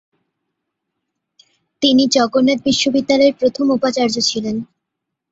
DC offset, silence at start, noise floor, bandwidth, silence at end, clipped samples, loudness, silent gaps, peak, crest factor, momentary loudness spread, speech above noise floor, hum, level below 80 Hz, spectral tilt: under 0.1%; 1.8 s; -79 dBFS; 8 kHz; 0.65 s; under 0.1%; -15 LUFS; none; -2 dBFS; 16 dB; 5 LU; 64 dB; none; -56 dBFS; -3.5 dB/octave